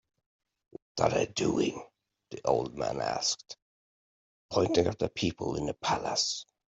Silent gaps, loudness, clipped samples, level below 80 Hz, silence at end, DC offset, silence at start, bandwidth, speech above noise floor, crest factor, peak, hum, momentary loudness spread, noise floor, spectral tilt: 3.62-4.49 s; -30 LUFS; under 0.1%; -60 dBFS; 0.35 s; under 0.1%; 0.95 s; 8.2 kHz; over 60 dB; 22 dB; -10 dBFS; none; 11 LU; under -90 dBFS; -4 dB/octave